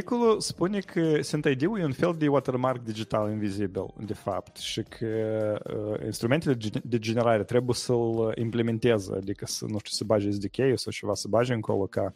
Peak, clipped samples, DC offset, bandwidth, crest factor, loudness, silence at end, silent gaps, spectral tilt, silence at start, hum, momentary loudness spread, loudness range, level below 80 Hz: -10 dBFS; under 0.1%; under 0.1%; 16 kHz; 18 dB; -28 LUFS; 0.05 s; none; -5.5 dB/octave; 0 s; none; 8 LU; 4 LU; -58 dBFS